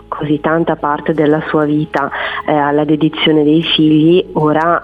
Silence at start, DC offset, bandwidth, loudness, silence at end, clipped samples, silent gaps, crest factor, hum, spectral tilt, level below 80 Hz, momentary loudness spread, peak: 0.1 s; under 0.1%; 5 kHz; -13 LUFS; 0 s; under 0.1%; none; 12 dB; none; -8 dB/octave; -44 dBFS; 6 LU; 0 dBFS